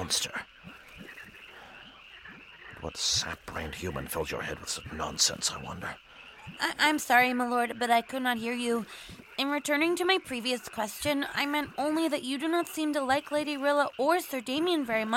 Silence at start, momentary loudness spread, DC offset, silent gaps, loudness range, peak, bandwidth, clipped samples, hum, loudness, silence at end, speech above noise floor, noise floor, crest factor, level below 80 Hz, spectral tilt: 0 s; 21 LU; under 0.1%; none; 7 LU; -10 dBFS; 16.5 kHz; under 0.1%; none; -29 LUFS; 0 s; 21 dB; -50 dBFS; 22 dB; -58 dBFS; -2.5 dB/octave